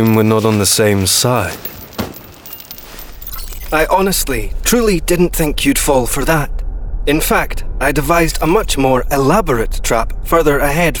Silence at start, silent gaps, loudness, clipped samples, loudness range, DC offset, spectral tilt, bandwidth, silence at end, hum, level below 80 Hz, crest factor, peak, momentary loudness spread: 0 s; none; -14 LUFS; under 0.1%; 3 LU; under 0.1%; -4 dB/octave; over 20 kHz; 0 s; none; -22 dBFS; 14 dB; 0 dBFS; 15 LU